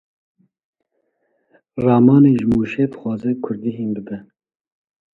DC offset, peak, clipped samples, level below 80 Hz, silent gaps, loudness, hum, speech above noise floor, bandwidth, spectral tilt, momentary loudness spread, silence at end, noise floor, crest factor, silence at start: under 0.1%; 0 dBFS; under 0.1%; -52 dBFS; none; -17 LUFS; none; 52 dB; 4.1 kHz; -10.5 dB/octave; 18 LU; 0.9 s; -69 dBFS; 18 dB; 1.75 s